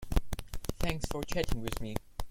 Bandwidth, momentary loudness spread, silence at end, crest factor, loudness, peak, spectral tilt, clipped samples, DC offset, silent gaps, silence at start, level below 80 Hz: 17 kHz; 7 LU; 0 s; 20 dB; -37 LUFS; -12 dBFS; -5 dB/octave; under 0.1%; under 0.1%; none; 0 s; -36 dBFS